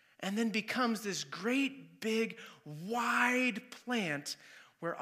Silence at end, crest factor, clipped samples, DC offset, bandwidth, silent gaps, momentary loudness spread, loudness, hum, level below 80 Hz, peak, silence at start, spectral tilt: 0 s; 20 dB; under 0.1%; under 0.1%; 15.5 kHz; none; 14 LU; -34 LUFS; none; under -90 dBFS; -16 dBFS; 0.2 s; -3.5 dB/octave